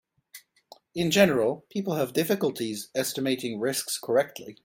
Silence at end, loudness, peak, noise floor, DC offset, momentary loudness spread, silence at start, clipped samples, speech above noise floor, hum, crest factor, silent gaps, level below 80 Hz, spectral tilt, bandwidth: 0.1 s; -26 LUFS; -6 dBFS; -56 dBFS; under 0.1%; 10 LU; 0.35 s; under 0.1%; 29 dB; none; 22 dB; none; -66 dBFS; -4 dB/octave; 17 kHz